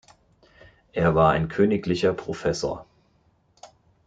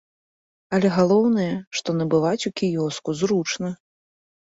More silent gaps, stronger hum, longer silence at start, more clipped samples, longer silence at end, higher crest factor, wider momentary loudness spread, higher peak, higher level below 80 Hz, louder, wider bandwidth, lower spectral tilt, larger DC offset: second, none vs 1.67-1.71 s; neither; first, 0.95 s vs 0.7 s; neither; second, 0.4 s vs 0.85 s; first, 22 dB vs 16 dB; first, 12 LU vs 9 LU; about the same, -4 dBFS vs -6 dBFS; first, -50 dBFS vs -62 dBFS; about the same, -23 LUFS vs -22 LUFS; first, 9 kHz vs 8 kHz; about the same, -6.5 dB/octave vs -5.5 dB/octave; neither